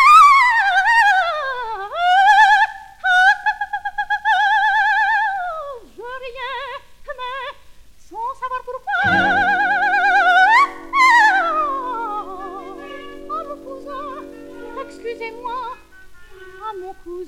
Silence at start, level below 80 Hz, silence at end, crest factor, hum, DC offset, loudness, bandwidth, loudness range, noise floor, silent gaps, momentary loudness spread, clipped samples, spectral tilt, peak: 0 s; -50 dBFS; 0 s; 16 dB; none; under 0.1%; -15 LUFS; 16 kHz; 16 LU; -42 dBFS; none; 21 LU; under 0.1%; -2.5 dB/octave; -2 dBFS